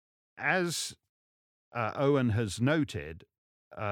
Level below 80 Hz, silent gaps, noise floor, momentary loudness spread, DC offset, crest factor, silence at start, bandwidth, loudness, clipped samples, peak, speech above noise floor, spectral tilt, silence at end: -62 dBFS; 1.09-1.72 s, 3.38-3.71 s; under -90 dBFS; 15 LU; under 0.1%; 20 dB; 0.35 s; 18 kHz; -31 LUFS; under 0.1%; -12 dBFS; over 60 dB; -5 dB/octave; 0 s